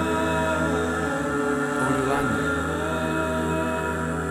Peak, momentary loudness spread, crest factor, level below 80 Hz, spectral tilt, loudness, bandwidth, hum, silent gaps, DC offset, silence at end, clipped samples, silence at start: -10 dBFS; 3 LU; 14 dB; -40 dBFS; -5.5 dB/octave; -24 LUFS; 17 kHz; none; none; under 0.1%; 0 s; under 0.1%; 0 s